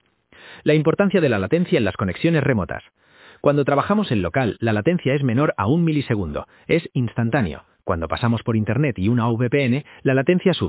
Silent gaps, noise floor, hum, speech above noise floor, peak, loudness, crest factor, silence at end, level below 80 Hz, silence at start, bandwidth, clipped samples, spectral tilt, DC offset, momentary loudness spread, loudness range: none; -48 dBFS; none; 29 dB; -2 dBFS; -20 LUFS; 18 dB; 0 s; -44 dBFS; 0.45 s; 4 kHz; under 0.1%; -11.5 dB/octave; under 0.1%; 7 LU; 2 LU